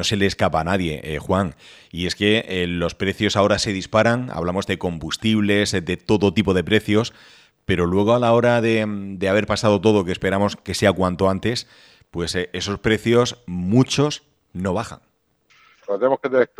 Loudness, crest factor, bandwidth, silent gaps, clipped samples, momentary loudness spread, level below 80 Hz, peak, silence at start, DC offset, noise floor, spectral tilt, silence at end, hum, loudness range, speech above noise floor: -20 LUFS; 18 dB; 14 kHz; none; under 0.1%; 10 LU; -46 dBFS; -2 dBFS; 0 s; under 0.1%; -60 dBFS; -5.5 dB/octave; 0.15 s; none; 3 LU; 40 dB